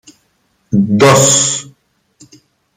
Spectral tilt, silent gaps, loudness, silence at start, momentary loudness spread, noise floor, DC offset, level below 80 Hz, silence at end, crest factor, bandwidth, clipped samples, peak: -3.5 dB/octave; none; -10 LUFS; 0.7 s; 10 LU; -60 dBFS; under 0.1%; -50 dBFS; 1.15 s; 14 dB; 16 kHz; under 0.1%; 0 dBFS